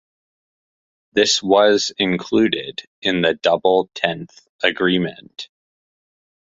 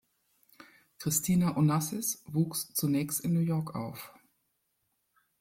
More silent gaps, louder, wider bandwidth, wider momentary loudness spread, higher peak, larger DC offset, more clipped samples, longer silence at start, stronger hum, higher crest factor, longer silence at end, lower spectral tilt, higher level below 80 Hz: first, 2.87-3.02 s, 4.49-4.59 s vs none; first, -18 LUFS vs -30 LUFS; second, 8.2 kHz vs 16.5 kHz; first, 17 LU vs 12 LU; first, 0 dBFS vs -14 dBFS; neither; neither; first, 1.15 s vs 0.6 s; neither; about the same, 20 dB vs 18 dB; second, 1.05 s vs 1.3 s; second, -3.5 dB/octave vs -5.5 dB/octave; first, -60 dBFS vs -66 dBFS